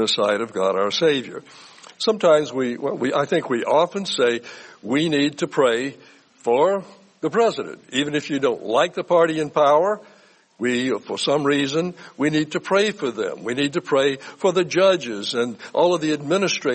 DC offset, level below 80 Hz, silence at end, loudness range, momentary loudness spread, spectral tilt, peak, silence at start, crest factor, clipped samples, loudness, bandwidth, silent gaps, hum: under 0.1%; -68 dBFS; 0 s; 2 LU; 8 LU; -4.5 dB/octave; -4 dBFS; 0 s; 16 dB; under 0.1%; -21 LUFS; 8.8 kHz; none; none